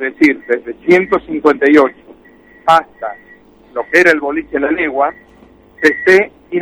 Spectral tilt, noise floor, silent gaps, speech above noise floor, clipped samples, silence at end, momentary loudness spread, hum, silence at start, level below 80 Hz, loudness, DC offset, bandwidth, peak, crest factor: -5 dB/octave; -44 dBFS; none; 32 dB; under 0.1%; 0 s; 11 LU; none; 0 s; -50 dBFS; -12 LUFS; under 0.1%; 13.5 kHz; 0 dBFS; 14 dB